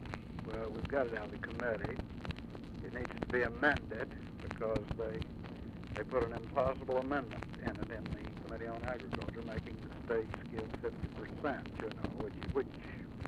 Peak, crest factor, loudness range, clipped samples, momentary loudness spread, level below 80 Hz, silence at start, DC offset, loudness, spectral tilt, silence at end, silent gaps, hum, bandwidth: -16 dBFS; 24 dB; 4 LU; under 0.1%; 10 LU; -52 dBFS; 0 s; under 0.1%; -40 LUFS; -7.5 dB/octave; 0 s; none; none; 12.5 kHz